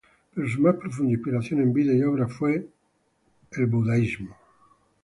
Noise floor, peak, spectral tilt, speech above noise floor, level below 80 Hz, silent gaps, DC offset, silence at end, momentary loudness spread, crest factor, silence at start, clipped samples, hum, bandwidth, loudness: -69 dBFS; -6 dBFS; -9 dB/octave; 46 dB; -58 dBFS; none; under 0.1%; 0.7 s; 11 LU; 18 dB; 0.35 s; under 0.1%; none; 11.5 kHz; -24 LUFS